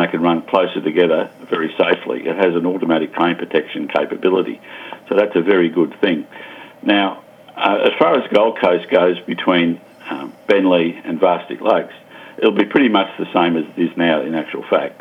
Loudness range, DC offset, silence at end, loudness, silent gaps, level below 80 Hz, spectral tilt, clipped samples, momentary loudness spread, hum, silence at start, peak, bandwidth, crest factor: 2 LU; under 0.1%; 0.05 s; -17 LUFS; none; -66 dBFS; -7 dB/octave; under 0.1%; 12 LU; none; 0 s; 0 dBFS; 11.5 kHz; 16 dB